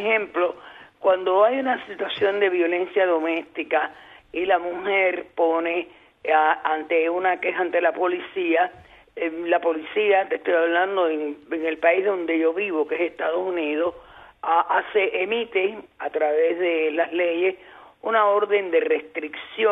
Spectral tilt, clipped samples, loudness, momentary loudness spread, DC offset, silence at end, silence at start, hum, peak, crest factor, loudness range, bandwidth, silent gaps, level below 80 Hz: -6 dB/octave; under 0.1%; -22 LUFS; 9 LU; under 0.1%; 0 s; 0 s; none; -6 dBFS; 18 dB; 2 LU; 4 kHz; none; -66 dBFS